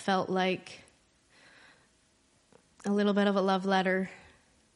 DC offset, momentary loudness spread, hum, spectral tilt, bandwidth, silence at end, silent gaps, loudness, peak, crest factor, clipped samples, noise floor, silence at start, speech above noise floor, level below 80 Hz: under 0.1%; 14 LU; none; -6 dB/octave; 11.5 kHz; 0.6 s; none; -29 LUFS; -12 dBFS; 20 dB; under 0.1%; -68 dBFS; 0 s; 39 dB; -74 dBFS